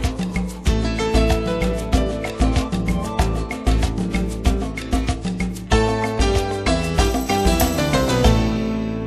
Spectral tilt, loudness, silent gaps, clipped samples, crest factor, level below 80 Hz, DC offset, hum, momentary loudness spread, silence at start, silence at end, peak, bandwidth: -5.5 dB/octave; -20 LUFS; none; under 0.1%; 18 dB; -24 dBFS; under 0.1%; none; 6 LU; 0 s; 0 s; -2 dBFS; 13.5 kHz